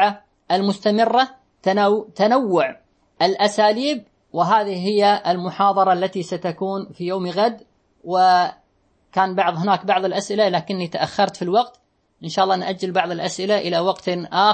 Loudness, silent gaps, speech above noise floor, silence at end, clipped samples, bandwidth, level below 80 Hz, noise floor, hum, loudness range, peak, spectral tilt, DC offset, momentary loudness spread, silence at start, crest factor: -20 LUFS; none; 43 dB; 0 s; under 0.1%; 8.8 kHz; -68 dBFS; -62 dBFS; none; 3 LU; -2 dBFS; -5 dB/octave; under 0.1%; 9 LU; 0 s; 18 dB